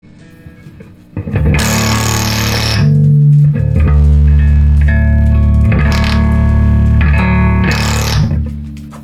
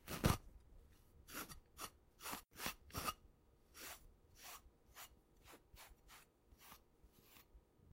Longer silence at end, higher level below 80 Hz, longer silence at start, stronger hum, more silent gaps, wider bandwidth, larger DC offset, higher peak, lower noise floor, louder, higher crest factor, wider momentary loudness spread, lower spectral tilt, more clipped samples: about the same, 0 s vs 0 s; first, -14 dBFS vs -60 dBFS; first, 0.45 s vs 0 s; neither; neither; about the same, 15 kHz vs 16 kHz; neither; first, 0 dBFS vs -22 dBFS; second, -36 dBFS vs -70 dBFS; first, -11 LUFS vs -49 LUFS; second, 10 dB vs 30 dB; second, 7 LU vs 21 LU; first, -5.5 dB/octave vs -4 dB/octave; neither